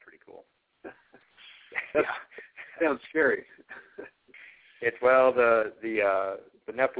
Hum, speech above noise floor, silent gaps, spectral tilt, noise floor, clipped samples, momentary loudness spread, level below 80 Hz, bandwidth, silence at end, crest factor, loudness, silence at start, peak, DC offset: none; 33 dB; none; -8 dB/octave; -58 dBFS; under 0.1%; 26 LU; -70 dBFS; 4 kHz; 0 s; 20 dB; -26 LUFS; 0.35 s; -8 dBFS; under 0.1%